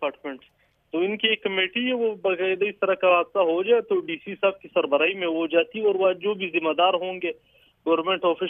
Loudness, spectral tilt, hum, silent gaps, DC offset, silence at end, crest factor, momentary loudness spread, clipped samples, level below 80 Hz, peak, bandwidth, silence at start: -23 LUFS; -7.5 dB/octave; none; none; under 0.1%; 0 s; 18 dB; 10 LU; under 0.1%; -72 dBFS; -6 dBFS; 3.8 kHz; 0 s